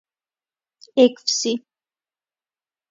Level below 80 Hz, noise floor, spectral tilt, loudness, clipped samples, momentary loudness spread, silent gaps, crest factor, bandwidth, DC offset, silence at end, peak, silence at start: -78 dBFS; under -90 dBFS; -2 dB/octave; -20 LUFS; under 0.1%; 9 LU; none; 22 dB; 7.8 kHz; under 0.1%; 1.3 s; -2 dBFS; 0.95 s